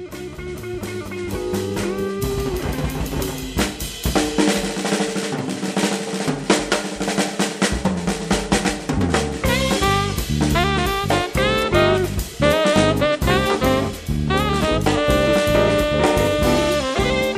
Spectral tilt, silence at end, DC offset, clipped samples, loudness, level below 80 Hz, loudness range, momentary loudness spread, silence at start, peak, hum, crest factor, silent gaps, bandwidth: -4.5 dB/octave; 0 s; under 0.1%; under 0.1%; -20 LUFS; -32 dBFS; 5 LU; 8 LU; 0 s; -2 dBFS; none; 18 dB; none; 15.5 kHz